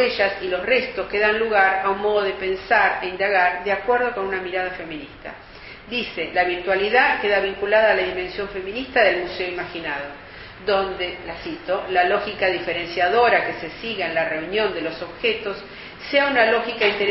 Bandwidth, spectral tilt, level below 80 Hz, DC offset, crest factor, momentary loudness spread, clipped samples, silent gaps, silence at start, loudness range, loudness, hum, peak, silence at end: 6 kHz; -0.5 dB/octave; -50 dBFS; under 0.1%; 20 dB; 14 LU; under 0.1%; none; 0 s; 4 LU; -21 LUFS; none; -2 dBFS; 0 s